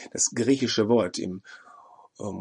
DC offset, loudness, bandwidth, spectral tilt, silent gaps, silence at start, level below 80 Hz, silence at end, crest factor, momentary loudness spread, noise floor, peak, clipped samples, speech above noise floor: under 0.1%; -24 LUFS; 11 kHz; -3.5 dB/octave; none; 0 s; -68 dBFS; 0 s; 18 dB; 15 LU; -52 dBFS; -10 dBFS; under 0.1%; 27 dB